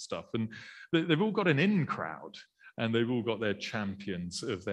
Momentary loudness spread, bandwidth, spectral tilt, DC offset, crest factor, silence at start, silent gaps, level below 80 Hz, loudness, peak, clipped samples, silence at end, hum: 16 LU; 11.5 kHz; -6 dB/octave; under 0.1%; 20 dB; 0 s; none; -70 dBFS; -32 LUFS; -12 dBFS; under 0.1%; 0 s; none